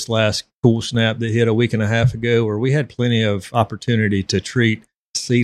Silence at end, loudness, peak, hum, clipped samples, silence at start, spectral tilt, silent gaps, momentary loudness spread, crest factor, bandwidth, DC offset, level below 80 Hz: 0 s; -18 LUFS; 0 dBFS; none; under 0.1%; 0 s; -5.5 dB/octave; 0.54-0.62 s, 4.96-5.14 s; 3 LU; 18 dB; 12 kHz; under 0.1%; -48 dBFS